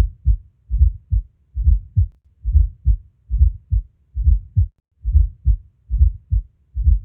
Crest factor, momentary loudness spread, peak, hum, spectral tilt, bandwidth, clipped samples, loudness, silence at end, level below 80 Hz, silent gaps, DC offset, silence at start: 14 dB; 10 LU; -4 dBFS; none; -17 dB/octave; 0.3 kHz; under 0.1%; -22 LUFS; 0 s; -18 dBFS; none; under 0.1%; 0 s